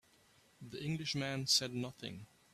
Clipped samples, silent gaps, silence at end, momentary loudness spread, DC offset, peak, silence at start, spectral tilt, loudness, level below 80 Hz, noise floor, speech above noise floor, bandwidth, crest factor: under 0.1%; none; 0.3 s; 20 LU; under 0.1%; -18 dBFS; 0.6 s; -3 dB/octave; -36 LUFS; -72 dBFS; -68 dBFS; 30 dB; 15.5 kHz; 22 dB